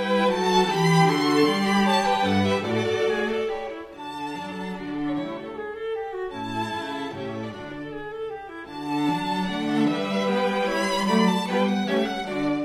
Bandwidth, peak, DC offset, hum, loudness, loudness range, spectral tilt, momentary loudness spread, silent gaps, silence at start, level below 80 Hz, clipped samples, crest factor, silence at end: 15.5 kHz; -8 dBFS; under 0.1%; none; -24 LUFS; 10 LU; -5.5 dB/octave; 14 LU; none; 0 s; -54 dBFS; under 0.1%; 16 dB; 0 s